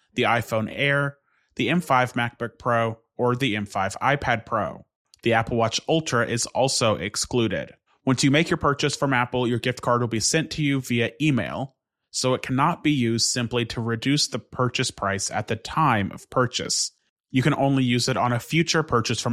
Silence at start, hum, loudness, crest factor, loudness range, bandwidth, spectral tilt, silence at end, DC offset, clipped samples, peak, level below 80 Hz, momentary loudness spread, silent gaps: 0.15 s; none; -23 LUFS; 18 dB; 2 LU; 15 kHz; -4.5 dB/octave; 0 s; under 0.1%; under 0.1%; -6 dBFS; -54 dBFS; 6 LU; 4.96-5.05 s, 17.09-17.16 s